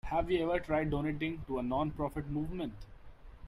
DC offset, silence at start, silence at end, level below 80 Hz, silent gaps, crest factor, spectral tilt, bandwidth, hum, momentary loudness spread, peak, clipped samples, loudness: under 0.1%; 0.05 s; 0 s; -48 dBFS; none; 16 dB; -8 dB/octave; 14 kHz; none; 8 LU; -20 dBFS; under 0.1%; -35 LUFS